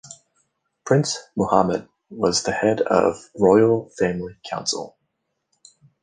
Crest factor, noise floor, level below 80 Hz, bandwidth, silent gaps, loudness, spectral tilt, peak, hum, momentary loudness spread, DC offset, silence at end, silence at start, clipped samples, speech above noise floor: 20 dB; -75 dBFS; -54 dBFS; 10 kHz; none; -21 LUFS; -5 dB/octave; -2 dBFS; none; 14 LU; under 0.1%; 1.15 s; 0.05 s; under 0.1%; 55 dB